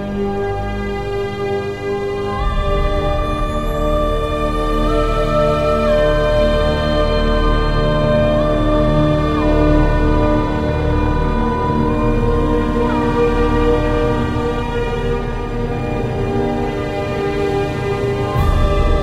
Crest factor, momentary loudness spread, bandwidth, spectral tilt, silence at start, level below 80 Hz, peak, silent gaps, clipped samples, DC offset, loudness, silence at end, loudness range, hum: 14 dB; 6 LU; 12 kHz; -7.5 dB/octave; 0 s; -20 dBFS; -2 dBFS; none; under 0.1%; under 0.1%; -17 LUFS; 0 s; 4 LU; none